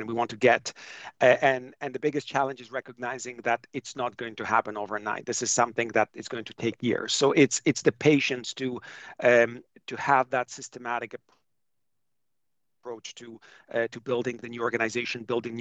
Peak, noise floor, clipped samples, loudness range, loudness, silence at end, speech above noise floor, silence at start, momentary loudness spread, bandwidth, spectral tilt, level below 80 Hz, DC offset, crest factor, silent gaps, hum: -6 dBFS; -87 dBFS; under 0.1%; 11 LU; -27 LUFS; 0 s; 60 dB; 0 s; 17 LU; 9.4 kHz; -3.5 dB/octave; -72 dBFS; under 0.1%; 22 dB; none; none